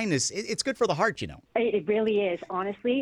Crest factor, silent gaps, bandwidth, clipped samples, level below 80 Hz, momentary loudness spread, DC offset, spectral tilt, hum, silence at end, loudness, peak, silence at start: 16 dB; none; 12 kHz; under 0.1%; -62 dBFS; 6 LU; under 0.1%; -4 dB/octave; none; 0 s; -27 LUFS; -10 dBFS; 0 s